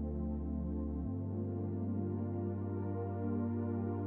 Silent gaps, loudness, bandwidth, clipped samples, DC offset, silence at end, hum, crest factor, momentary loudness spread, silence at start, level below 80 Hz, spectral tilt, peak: none; -39 LUFS; 2.5 kHz; under 0.1%; under 0.1%; 0 s; none; 12 dB; 2 LU; 0 s; -48 dBFS; -13 dB/octave; -26 dBFS